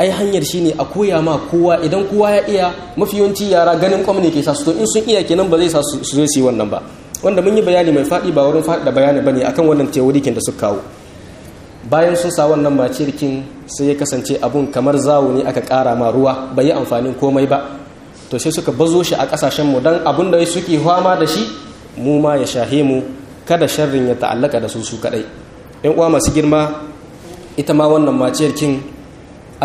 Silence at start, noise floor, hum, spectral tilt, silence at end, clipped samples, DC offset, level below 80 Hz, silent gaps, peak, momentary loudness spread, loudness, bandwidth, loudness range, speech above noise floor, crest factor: 0 s; -36 dBFS; none; -5 dB/octave; 0 s; under 0.1%; under 0.1%; -42 dBFS; none; 0 dBFS; 9 LU; -14 LUFS; 15 kHz; 3 LU; 22 dB; 14 dB